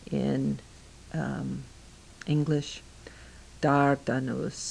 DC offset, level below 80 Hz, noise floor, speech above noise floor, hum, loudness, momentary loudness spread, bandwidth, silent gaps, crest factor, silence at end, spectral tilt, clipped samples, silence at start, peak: under 0.1%; -54 dBFS; -49 dBFS; 21 dB; none; -29 LUFS; 24 LU; 10.5 kHz; none; 20 dB; 0 s; -6 dB/octave; under 0.1%; 0 s; -10 dBFS